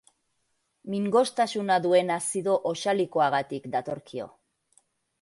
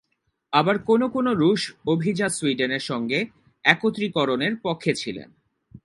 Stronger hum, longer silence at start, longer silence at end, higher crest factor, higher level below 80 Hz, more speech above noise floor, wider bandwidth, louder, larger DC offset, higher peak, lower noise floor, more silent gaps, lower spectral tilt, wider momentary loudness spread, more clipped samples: neither; first, 0.85 s vs 0.5 s; first, 0.95 s vs 0.05 s; second, 18 dB vs 24 dB; second, -74 dBFS vs -62 dBFS; about the same, 49 dB vs 51 dB; about the same, 11.5 kHz vs 11.5 kHz; second, -26 LUFS vs -23 LUFS; neither; second, -10 dBFS vs 0 dBFS; about the same, -75 dBFS vs -74 dBFS; neither; about the same, -4.5 dB/octave vs -5 dB/octave; first, 14 LU vs 6 LU; neither